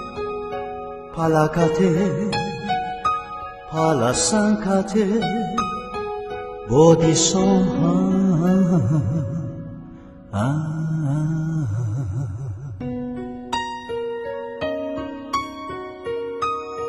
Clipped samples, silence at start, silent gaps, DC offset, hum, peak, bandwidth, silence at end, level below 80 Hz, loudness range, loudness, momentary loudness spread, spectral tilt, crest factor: under 0.1%; 0 s; none; under 0.1%; none; -2 dBFS; 12 kHz; 0 s; -46 dBFS; 10 LU; -21 LUFS; 14 LU; -5.5 dB/octave; 20 dB